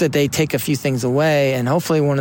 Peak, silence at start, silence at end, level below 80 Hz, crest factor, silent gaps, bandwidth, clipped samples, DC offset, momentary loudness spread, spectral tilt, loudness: -6 dBFS; 0 s; 0 s; -52 dBFS; 12 dB; none; 17 kHz; under 0.1%; under 0.1%; 3 LU; -5.5 dB/octave; -18 LUFS